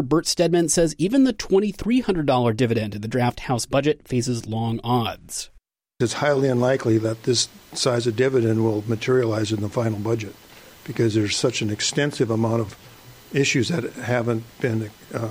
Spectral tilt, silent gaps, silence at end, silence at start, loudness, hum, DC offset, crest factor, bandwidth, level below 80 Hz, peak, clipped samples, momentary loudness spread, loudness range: -5 dB/octave; none; 0 s; 0 s; -22 LUFS; none; under 0.1%; 14 dB; 16 kHz; -48 dBFS; -8 dBFS; under 0.1%; 7 LU; 3 LU